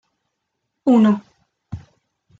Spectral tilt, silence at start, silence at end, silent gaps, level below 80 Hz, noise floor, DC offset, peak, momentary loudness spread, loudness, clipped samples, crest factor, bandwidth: -8.5 dB/octave; 0.85 s; 0.6 s; none; -58 dBFS; -76 dBFS; under 0.1%; -6 dBFS; 22 LU; -17 LUFS; under 0.1%; 16 dB; 7.6 kHz